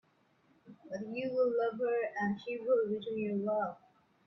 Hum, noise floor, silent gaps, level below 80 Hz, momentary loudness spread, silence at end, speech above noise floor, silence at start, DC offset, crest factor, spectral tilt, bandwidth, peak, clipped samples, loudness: none; -70 dBFS; none; -78 dBFS; 9 LU; 0.5 s; 37 dB; 0.65 s; under 0.1%; 16 dB; -7.5 dB/octave; 6 kHz; -20 dBFS; under 0.1%; -34 LUFS